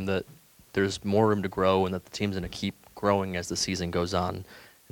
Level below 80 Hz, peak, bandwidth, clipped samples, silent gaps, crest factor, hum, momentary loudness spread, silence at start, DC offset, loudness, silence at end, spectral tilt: -54 dBFS; -8 dBFS; 19 kHz; under 0.1%; none; 20 dB; none; 10 LU; 0 s; under 0.1%; -28 LUFS; 0.25 s; -5 dB/octave